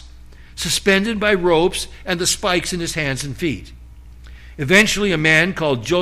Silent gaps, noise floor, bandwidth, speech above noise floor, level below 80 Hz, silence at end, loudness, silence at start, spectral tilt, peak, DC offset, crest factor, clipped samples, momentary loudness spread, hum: none; -40 dBFS; 15.5 kHz; 22 dB; -38 dBFS; 0 s; -17 LUFS; 0 s; -3.5 dB/octave; -2 dBFS; under 0.1%; 16 dB; under 0.1%; 11 LU; 60 Hz at -40 dBFS